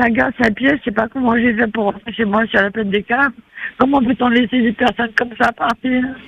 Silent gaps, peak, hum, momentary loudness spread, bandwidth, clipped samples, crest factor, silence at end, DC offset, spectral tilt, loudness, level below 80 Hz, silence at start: none; 0 dBFS; none; 5 LU; 7.6 kHz; under 0.1%; 16 dB; 0 s; under 0.1%; -6.5 dB/octave; -16 LUFS; -46 dBFS; 0 s